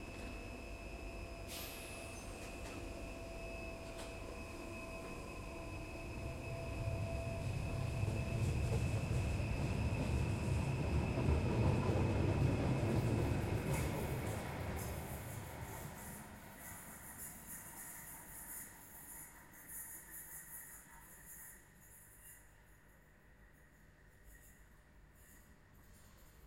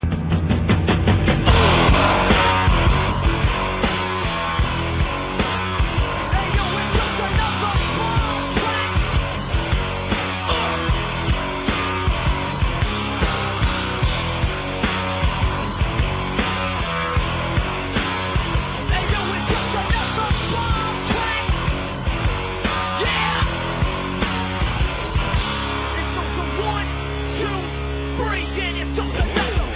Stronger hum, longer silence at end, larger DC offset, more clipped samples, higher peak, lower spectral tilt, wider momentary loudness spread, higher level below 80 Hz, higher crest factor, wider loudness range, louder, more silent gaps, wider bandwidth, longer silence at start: neither; about the same, 0 s vs 0 s; neither; neither; second, -22 dBFS vs -2 dBFS; second, -6 dB/octave vs -10 dB/octave; first, 19 LU vs 6 LU; second, -50 dBFS vs -26 dBFS; about the same, 20 dB vs 18 dB; first, 16 LU vs 6 LU; second, -42 LUFS vs -21 LUFS; neither; first, 16.5 kHz vs 4 kHz; about the same, 0 s vs 0 s